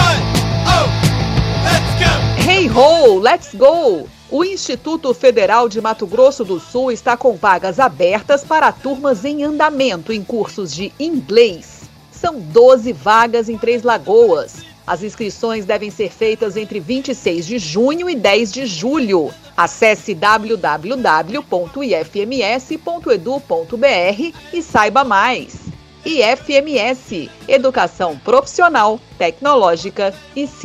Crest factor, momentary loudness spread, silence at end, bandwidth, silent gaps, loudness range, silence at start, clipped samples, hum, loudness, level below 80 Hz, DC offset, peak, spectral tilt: 14 dB; 11 LU; 0 s; 15 kHz; none; 5 LU; 0 s; under 0.1%; none; -15 LUFS; -36 dBFS; under 0.1%; 0 dBFS; -5 dB/octave